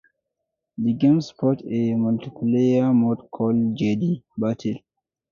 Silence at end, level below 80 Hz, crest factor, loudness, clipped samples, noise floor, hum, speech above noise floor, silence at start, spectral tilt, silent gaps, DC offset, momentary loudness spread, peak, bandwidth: 0.55 s; -62 dBFS; 14 dB; -22 LUFS; under 0.1%; -81 dBFS; none; 60 dB; 0.8 s; -8.5 dB/octave; none; under 0.1%; 8 LU; -8 dBFS; 7 kHz